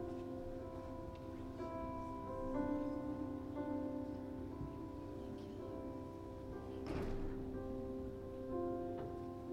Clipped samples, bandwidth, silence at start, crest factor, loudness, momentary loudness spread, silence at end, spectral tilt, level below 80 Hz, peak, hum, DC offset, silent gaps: under 0.1%; 16.5 kHz; 0 s; 16 dB; -46 LUFS; 7 LU; 0 s; -8.5 dB/octave; -56 dBFS; -28 dBFS; none; under 0.1%; none